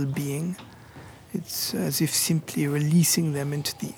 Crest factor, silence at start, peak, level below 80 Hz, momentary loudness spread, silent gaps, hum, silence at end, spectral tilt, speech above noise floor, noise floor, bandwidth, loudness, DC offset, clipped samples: 16 dB; 0 s; -10 dBFS; -62 dBFS; 14 LU; none; none; 0 s; -4.5 dB/octave; 20 dB; -46 dBFS; 18.5 kHz; -25 LUFS; under 0.1%; under 0.1%